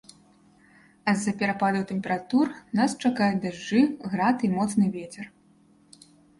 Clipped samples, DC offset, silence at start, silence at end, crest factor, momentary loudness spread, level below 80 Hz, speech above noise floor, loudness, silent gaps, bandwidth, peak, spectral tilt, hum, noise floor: under 0.1%; under 0.1%; 1.05 s; 1.1 s; 16 dB; 7 LU; -64 dBFS; 34 dB; -25 LUFS; none; 11.5 kHz; -10 dBFS; -5.5 dB/octave; none; -59 dBFS